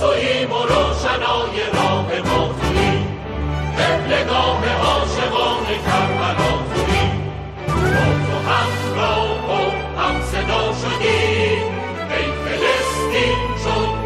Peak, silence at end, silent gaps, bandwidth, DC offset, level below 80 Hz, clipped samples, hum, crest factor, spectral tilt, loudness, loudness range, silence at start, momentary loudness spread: -4 dBFS; 0 s; none; 14.5 kHz; under 0.1%; -30 dBFS; under 0.1%; none; 14 dB; -5 dB/octave; -18 LUFS; 1 LU; 0 s; 5 LU